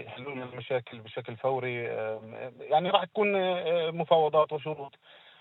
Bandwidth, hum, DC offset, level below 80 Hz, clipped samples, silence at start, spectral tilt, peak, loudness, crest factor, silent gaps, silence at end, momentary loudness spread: 4.2 kHz; none; under 0.1%; -80 dBFS; under 0.1%; 0 s; -8 dB/octave; -8 dBFS; -29 LUFS; 22 dB; none; 0.25 s; 15 LU